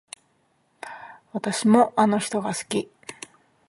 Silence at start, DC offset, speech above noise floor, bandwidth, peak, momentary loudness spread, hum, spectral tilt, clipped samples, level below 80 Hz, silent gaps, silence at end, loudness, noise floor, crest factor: 0.85 s; under 0.1%; 45 dB; 11.5 kHz; -4 dBFS; 24 LU; none; -4.5 dB/octave; under 0.1%; -70 dBFS; none; 0.55 s; -22 LUFS; -67 dBFS; 22 dB